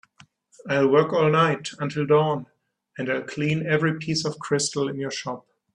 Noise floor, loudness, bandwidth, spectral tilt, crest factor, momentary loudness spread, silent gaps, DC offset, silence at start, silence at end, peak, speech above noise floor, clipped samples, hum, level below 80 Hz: -56 dBFS; -23 LUFS; 10.5 kHz; -5 dB/octave; 18 dB; 13 LU; none; under 0.1%; 0.65 s; 0.35 s; -6 dBFS; 33 dB; under 0.1%; none; -64 dBFS